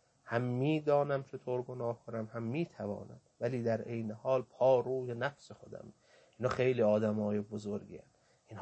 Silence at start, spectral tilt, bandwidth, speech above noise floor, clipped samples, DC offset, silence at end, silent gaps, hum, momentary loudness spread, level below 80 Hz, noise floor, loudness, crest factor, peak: 0.25 s; -8 dB/octave; 8.6 kHz; 19 dB; under 0.1%; under 0.1%; 0 s; none; none; 21 LU; -72 dBFS; -53 dBFS; -35 LUFS; 18 dB; -18 dBFS